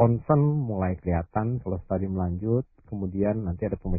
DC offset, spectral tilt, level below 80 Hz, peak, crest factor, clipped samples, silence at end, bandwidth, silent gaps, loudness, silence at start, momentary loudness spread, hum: under 0.1%; -16 dB/octave; -40 dBFS; -6 dBFS; 20 dB; under 0.1%; 0 s; 2.7 kHz; none; -27 LUFS; 0 s; 9 LU; none